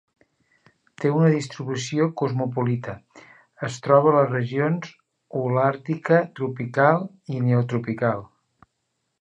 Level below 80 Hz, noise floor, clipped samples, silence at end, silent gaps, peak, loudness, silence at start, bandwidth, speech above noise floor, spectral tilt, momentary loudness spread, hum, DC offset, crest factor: -66 dBFS; -76 dBFS; under 0.1%; 0.95 s; none; -2 dBFS; -23 LUFS; 1 s; 8.4 kHz; 54 dB; -7 dB/octave; 13 LU; none; under 0.1%; 20 dB